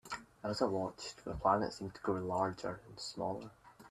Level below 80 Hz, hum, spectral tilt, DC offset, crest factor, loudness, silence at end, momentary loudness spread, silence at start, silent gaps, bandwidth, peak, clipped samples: -62 dBFS; none; -5.5 dB/octave; under 0.1%; 22 dB; -38 LUFS; 0 s; 12 LU; 0.05 s; none; 14 kHz; -16 dBFS; under 0.1%